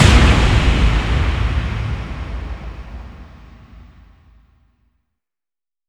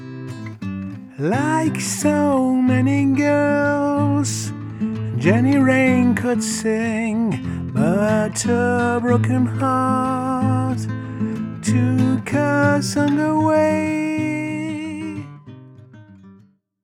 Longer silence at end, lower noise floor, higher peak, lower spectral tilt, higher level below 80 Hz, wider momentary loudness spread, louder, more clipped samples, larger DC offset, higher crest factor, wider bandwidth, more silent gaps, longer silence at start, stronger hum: first, 2.1 s vs 0.5 s; first, under -90 dBFS vs -52 dBFS; about the same, 0 dBFS vs -2 dBFS; about the same, -5.5 dB/octave vs -6 dB/octave; first, -20 dBFS vs -56 dBFS; first, 23 LU vs 11 LU; about the same, -17 LUFS vs -19 LUFS; neither; neither; about the same, 18 dB vs 16 dB; second, 11.5 kHz vs 15.5 kHz; neither; about the same, 0 s vs 0 s; neither